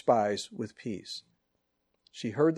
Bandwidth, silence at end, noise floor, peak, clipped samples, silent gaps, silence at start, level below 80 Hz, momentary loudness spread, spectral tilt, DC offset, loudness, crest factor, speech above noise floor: 12.5 kHz; 0 s; -79 dBFS; -10 dBFS; under 0.1%; none; 0.05 s; -76 dBFS; 15 LU; -5.5 dB/octave; under 0.1%; -33 LUFS; 22 dB; 49 dB